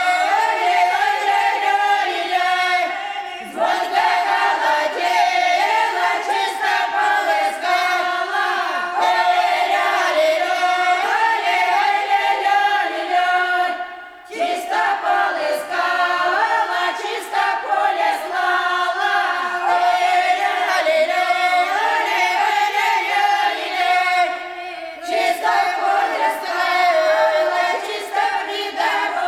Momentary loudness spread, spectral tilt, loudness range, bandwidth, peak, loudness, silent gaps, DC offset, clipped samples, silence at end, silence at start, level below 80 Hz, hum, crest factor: 5 LU; -0.5 dB/octave; 2 LU; 15.5 kHz; -6 dBFS; -18 LUFS; none; under 0.1%; under 0.1%; 0 s; 0 s; -66 dBFS; none; 14 dB